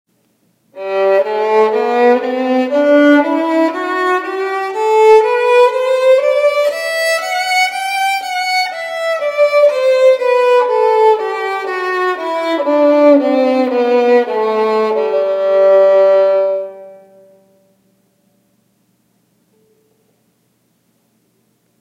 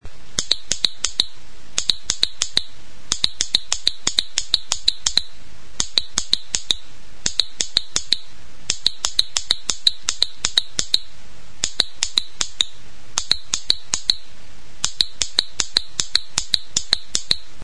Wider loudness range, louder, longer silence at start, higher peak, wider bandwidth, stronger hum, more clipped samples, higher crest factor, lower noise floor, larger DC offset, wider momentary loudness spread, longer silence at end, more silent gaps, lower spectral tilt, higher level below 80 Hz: about the same, 3 LU vs 2 LU; first, -12 LUFS vs -20 LUFS; first, 0.75 s vs 0 s; about the same, 0 dBFS vs 0 dBFS; first, 16 kHz vs 11 kHz; neither; neither; second, 14 dB vs 24 dB; first, -60 dBFS vs -45 dBFS; second, under 0.1% vs 7%; about the same, 9 LU vs 7 LU; first, 4.85 s vs 0.25 s; neither; first, -3 dB/octave vs 0.5 dB/octave; second, -74 dBFS vs -44 dBFS